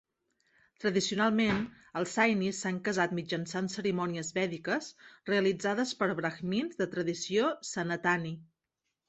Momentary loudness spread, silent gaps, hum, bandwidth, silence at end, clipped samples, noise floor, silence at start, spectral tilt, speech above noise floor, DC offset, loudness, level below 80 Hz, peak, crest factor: 8 LU; none; none; 8.4 kHz; 0.65 s; under 0.1%; -86 dBFS; 0.8 s; -4.5 dB/octave; 54 dB; under 0.1%; -31 LUFS; -68 dBFS; -12 dBFS; 20 dB